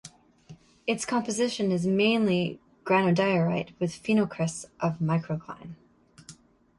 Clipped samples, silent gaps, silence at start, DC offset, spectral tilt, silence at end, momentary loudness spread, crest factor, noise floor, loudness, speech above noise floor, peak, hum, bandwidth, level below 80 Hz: under 0.1%; none; 0.05 s; under 0.1%; -5.5 dB/octave; 0.45 s; 12 LU; 16 dB; -53 dBFS; -27 LUFS; 27 dB; -12 dBFS; none; 11.5 kHz; -64 dBFS